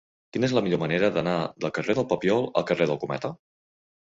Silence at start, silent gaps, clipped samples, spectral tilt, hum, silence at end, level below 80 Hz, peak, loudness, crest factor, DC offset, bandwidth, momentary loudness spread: 0.35 s; none; under 0.1%; -6.5 dB/octave; none; 0.7 s; -62 dBFS; -8 dBFS; -26 LUFS; 18 dB; under 0.1%; 7.8 kHz; 7 LU